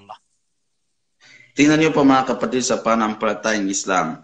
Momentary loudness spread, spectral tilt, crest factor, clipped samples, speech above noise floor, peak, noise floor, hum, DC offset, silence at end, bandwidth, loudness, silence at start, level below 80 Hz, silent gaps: 7 LU; -4 dB/octave; 16 dB; under 0.1%; 58 dB; -2 dBFS; -76 dBFS; none; under 0.1%; 0.05 s; 9 kHz; -18 LUFS; 0.1 s; -54 dBFS; none